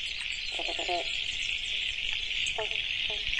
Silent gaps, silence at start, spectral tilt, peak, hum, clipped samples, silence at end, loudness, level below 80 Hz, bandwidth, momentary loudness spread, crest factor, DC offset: none; 0 s; -0.5 dB/octave; -14 dBFS; none; under 0.1%; 0 s; -30 LUFS; -50 dBFS; 11.5 kHz; 2 LU; 18 dB; under 0.1%